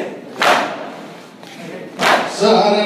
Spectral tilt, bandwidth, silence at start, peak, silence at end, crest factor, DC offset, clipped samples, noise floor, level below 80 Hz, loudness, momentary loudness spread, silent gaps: -3.5 dB/octave; 15.5 kHz; 0 s; -2 dBFS; 0 s; 16 dB; under 0.1%; under 0.1%; -36 dBFS; -62 dBFS; -15 LUFS; 21 LU; none